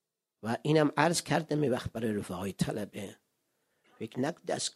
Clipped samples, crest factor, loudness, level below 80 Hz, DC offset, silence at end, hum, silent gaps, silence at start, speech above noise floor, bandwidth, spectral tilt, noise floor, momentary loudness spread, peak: under 0.1%; 22 dB; -31 LUFS; -62 dBFS; under 0.1%; 0.05 s; none; none; 0.45 s; 47 dB; 14 kHz; -5 dB/octave; -78 dBFS; 15 LU; -10 dBFS